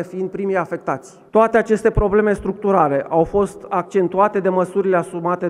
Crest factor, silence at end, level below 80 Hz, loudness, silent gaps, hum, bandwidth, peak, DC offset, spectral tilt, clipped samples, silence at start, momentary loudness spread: 16 dB; 0 s; -36 dBFS; -18 LUFS; none; none; 11.5 kHz; -2 dBFS; under 0.1%; -7.5 dB/octave; under 0.1%; 0 s; 8 LU